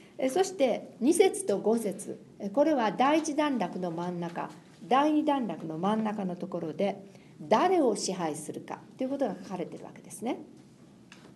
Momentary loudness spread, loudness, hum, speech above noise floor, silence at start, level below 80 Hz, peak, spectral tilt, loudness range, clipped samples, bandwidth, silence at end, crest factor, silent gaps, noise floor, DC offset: 15 LU; -29 LUFS; none; 26 dB; 0.2 s; -76 dBFS; -10 dBFS; -5 dB/octave; 3 LU; under 0.1%; 12 kHz; 0.1 s; 20 dB; none; -55 dBFS; under 0.1%